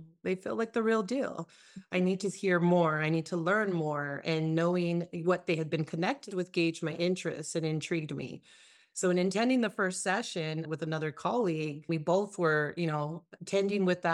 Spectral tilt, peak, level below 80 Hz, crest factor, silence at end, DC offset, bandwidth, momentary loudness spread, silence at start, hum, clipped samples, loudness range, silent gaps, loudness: -5.5 dB/octave; -14 dBFS; -78 dBFS; 16 dB; 0 s; under 0.1%; 11.5 kHz; 7 LU; 0 s; none; under 0.1%; 3 LU; none; -31 LUFS